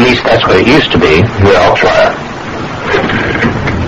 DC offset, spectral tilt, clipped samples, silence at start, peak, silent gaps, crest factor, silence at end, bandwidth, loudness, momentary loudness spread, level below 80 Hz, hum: under 0.1%; -6 dB/octave; 0.7%; 0 s; 0 dBFS; none; 8 dB; 0 s; 10 kHz; -8 LUFS; 12 LU; -28 dBFS; none